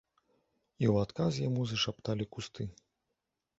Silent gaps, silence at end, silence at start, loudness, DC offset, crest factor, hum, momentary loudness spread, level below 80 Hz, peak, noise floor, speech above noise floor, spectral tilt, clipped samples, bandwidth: none; 0.85 s; 0.8 s; -34 LUFS; under 0.1%; 20 dB; none; 11 LU; -60 dBFS; -14 dBFS; -86 dBFS; 53 dB; -6 dB/octave; under 0.1%; 8 kHz